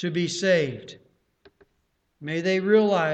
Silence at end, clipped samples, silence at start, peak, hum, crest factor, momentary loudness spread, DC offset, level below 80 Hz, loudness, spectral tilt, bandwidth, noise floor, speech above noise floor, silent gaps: 0 s; under 0.1%; 0 s; -8 dBFS; none; 18 dB; 20 LU; under 0.1%; -68 dBFS; -23 LUFS; -5 dB/octave; 9 kHz; -72 dBFS; 49 dB; none